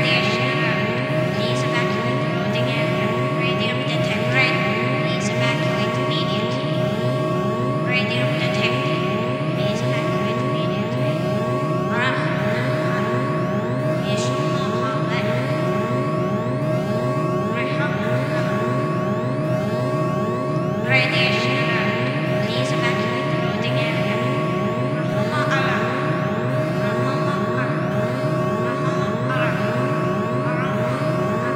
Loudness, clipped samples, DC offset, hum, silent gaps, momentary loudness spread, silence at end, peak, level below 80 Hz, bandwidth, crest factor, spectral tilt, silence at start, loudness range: -21 LUFS; under 0.1%; under 0.1%; none; none; 3 LU; 0 s; -4 dBFS; -54 dBFS; 15 kHz; 18 dB; -6.5 dB/octave; 0 s; 2 LU